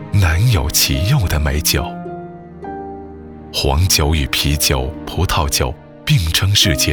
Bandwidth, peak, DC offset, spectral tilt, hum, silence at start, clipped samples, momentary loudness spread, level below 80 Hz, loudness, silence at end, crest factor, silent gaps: over 20 kHz; 0 dBFS; under 0.1%; -3.5 dB/octave; none; 0 s; under 0.1%; 17 LU; -24 dBFS; -15 LUFS; 0 s; 16 dB; none